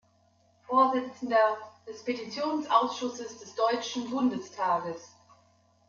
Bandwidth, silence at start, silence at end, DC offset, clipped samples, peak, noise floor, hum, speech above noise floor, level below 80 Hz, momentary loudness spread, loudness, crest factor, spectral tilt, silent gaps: 7.4 kHz; 0.7 s; 0.8 s; under 0.1%; under 0.1%; -10 dBFS; -66 dBFS; none; 37 dB; -76 dBFS; 14 LU; -29 LUFS; 20 dB; -4 dB/octave; none